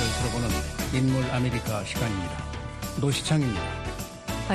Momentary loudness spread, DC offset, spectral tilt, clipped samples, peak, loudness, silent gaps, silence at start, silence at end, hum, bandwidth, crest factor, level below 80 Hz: 10 LU; under 0.1%; -5 dB/octave; under 0.1%; -12 dBFS; -28 LUFS; none; 0 s; 0 s; none; 13 kHz; 16 dB; -38 dBFS